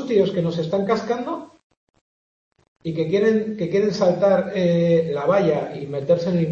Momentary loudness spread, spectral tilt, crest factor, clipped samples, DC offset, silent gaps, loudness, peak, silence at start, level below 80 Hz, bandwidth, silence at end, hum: 10 LU; -7.5 dB/octave; 14 dB; under 0.1%; under 0.1%; 1.63-1.70 s, 1.77-1.87 s, 2.01-2.51 s, 2.68-2.76 s; -21 LUFS; -6 dBFS; 0 s; -60 dBFS; 7.4 kHz; 0 s; none